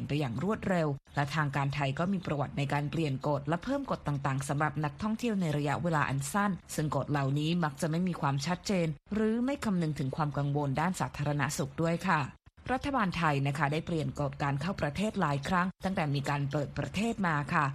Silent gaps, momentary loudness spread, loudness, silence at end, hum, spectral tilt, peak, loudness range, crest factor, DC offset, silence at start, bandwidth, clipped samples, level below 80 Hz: none; 4 LU; -32 LUFS; 0 s; none; -6 dB/octave; -12 dBFS; 1 LU; 20 dB; under 0.1%; 0 s; 13.5 kHz; under 0.1%; -54 dBFS